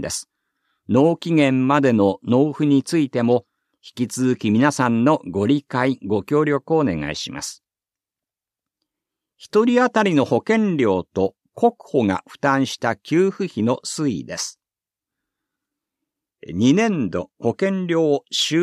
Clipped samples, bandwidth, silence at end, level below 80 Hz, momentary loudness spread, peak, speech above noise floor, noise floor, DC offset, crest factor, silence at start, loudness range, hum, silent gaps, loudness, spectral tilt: under 0.1%; 14 kHz; 0 s; -58 dBFS; 9 LU; -4 dBFS; 71 dB; -90 dBFS; under 0.1%; 16 dB; 0 s; 6 LU; none; none; -20 LUFS; -5.5 dB/octave